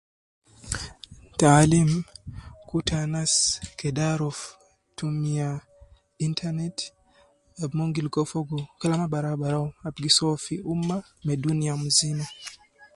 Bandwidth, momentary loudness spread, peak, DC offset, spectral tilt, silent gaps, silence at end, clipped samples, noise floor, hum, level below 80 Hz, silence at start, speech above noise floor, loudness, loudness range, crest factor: 11.5 kHz; 17 LU; -4 dBFS; under 0.1%; -4.5 dB/octave; none; 0.1 s; under 0.1%; -60 dBFS; none; -50 dBFS; 0.65 s; 36 dB; -25 LUFS; 7 LU; 22 dB